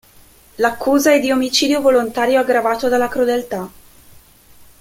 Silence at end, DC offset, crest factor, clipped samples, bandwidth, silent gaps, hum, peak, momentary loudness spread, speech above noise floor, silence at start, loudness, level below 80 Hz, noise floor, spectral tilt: 0.15 s; under 0.1%; 16 dB; under 0.1%; 16.5 kHz; none; none; -2 dBFS; 7 LU; 31 dB; 0.6 s; -16 LUFS; -50 dBFS; -47 dBFS; -3 dB/octave